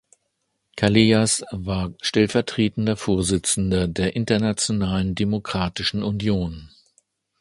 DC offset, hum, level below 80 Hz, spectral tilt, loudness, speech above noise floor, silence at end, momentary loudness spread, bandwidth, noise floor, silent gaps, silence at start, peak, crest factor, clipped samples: under 0.1%; none; -42 dBFS; -4.5 dB/octave; -22 LUFS; 53 dB; 0.75 s; 8 LU; 11.5 kHz; -74 dBFS; none; 0.75 s; 0 dBFS; 22 dB; under 0.1%